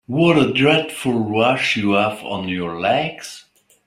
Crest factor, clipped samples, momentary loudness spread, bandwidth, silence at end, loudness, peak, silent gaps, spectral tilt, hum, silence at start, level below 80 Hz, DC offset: 16 dB; under 0.1%; 11 LU; 15.5 kHz; 0.45 s; -18 LUFS; -2 dBFS; none; -5.5 dB/octave; none; 0.1 s; -56 dBFS; under 0.1%